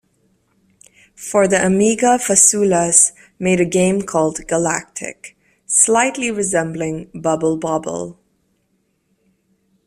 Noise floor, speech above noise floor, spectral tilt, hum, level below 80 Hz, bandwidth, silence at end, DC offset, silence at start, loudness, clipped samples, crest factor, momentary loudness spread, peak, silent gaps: -65 dBFS; 49 dB; -3.5 dB/octave; none; -54 dBFS; 15.5 kHz; 1.75 s; under 0.1%; 1.2 s; -15 LUFS; under 0.1%; 18 dB; 14 LU; 0 dBFS; none